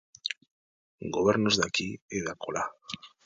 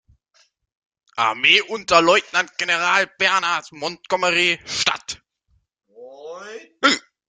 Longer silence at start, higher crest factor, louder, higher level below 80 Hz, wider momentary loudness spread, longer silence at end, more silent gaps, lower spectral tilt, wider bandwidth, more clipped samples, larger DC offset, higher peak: second, 0.25 s vs 1.15 s; about the same, 22 dB vs 22 dB; second, -29 LUFS vs -18 LUFS; about the same, -60 dBFS vs -60 dBFS; second, 16 LU vs 21 LU; about the same, 0.2 s vs 0.3 s; first, 0.37-0.41 s, 0.51-0.98 s, 2.02-2.08 s vs none; first, -3.5 dB/octave vs -1.5 dB/octave; about the same, 9.4 kHz vs 9.6 kHz; neither; neither; second, -8 dBFS vs 0 dBFS